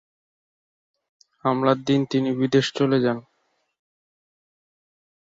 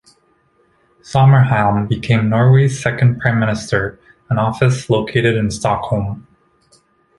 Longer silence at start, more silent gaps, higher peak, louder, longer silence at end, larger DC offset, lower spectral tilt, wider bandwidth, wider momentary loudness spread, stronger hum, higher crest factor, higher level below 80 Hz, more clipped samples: first, 1.45 s vs 1.05 s; neither; second, -6 dBFS vs 0 dBFS; second, -22 LUFS vs -15 LUFS; first, 2 s vs 1 s; neither; about the same, -6.5 dB/octave vs -7 dB/octave; second, 7.8 kHz vs 11.5 kHz; second, 5 LU vs 9 LU; neither; about the same, 20 dB vs 16 dB; second, -66 dBFS vs -42 dBFS; neither